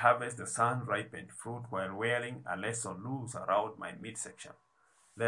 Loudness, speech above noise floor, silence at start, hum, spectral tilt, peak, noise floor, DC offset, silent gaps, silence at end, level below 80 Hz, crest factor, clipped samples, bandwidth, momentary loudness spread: -35 LUFS; 34 dB; 0 s; none; -4 dB/octave; -12 dBFS; -69 dBFS; under 0.1%; none; 0 s; -78 dBFS; 24 dB; under 0.1%; 11.5 kHz; 12 LU